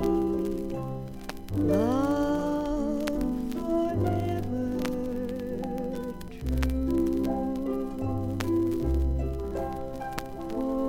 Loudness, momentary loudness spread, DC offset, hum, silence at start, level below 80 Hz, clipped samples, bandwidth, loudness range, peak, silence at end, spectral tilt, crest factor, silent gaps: -30 LUFS; 9 LU; under 0.1%; none; 0 s; -38 dBFS; under 0.1%; 17 kHz; 3 LU; -10 dBFS; 0 s; -7.5 dB/octave; 18 dB; none